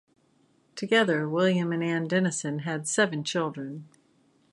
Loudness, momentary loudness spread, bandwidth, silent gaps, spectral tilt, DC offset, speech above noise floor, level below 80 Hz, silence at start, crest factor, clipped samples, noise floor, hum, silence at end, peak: -26 LUFS; 15 LU; 11.5 kHz; none; -4.5 dB/octave; under 0.1%; 39 dB; -78 dBFS; 0.75 s; 20 dB; under 0.1%; -66 dBFS; none; 0.65 s; -8 dBFS